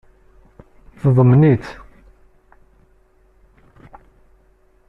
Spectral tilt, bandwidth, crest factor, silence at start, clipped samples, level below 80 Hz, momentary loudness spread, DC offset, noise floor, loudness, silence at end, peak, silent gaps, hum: -10.5 dB/octave; 5.8 kHz; 18 dB; 1.05 s; under 0.1%; -48 dBFS; 24 LU; under 0.1%; -55 dBFS; -14 LUFS; 3.15 s; -2 dBFS; none; none